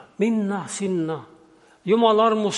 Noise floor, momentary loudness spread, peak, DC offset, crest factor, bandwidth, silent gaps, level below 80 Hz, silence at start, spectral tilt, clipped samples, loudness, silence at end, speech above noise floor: -54 dBFS; 13 LU; -6 dBFS; under 0.1%; 16 dB; 11.5 kHz; none; -74 dBFS; 0.2 s; -5 dB/octave; under 0.1%; -21 LUFS; 0 s; 33 dB